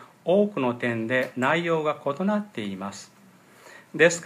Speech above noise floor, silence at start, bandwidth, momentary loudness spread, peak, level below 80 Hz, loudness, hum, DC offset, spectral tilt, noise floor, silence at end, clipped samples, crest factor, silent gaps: 29 dB; 0 s; 15 kHz; 13 LU; -4 dBFS; -76 dBFS; -25 LUFS; none; under 0.1%; -5 dB/octave; -53 dBFS; 0 s; under 0.1%; 22 dB; none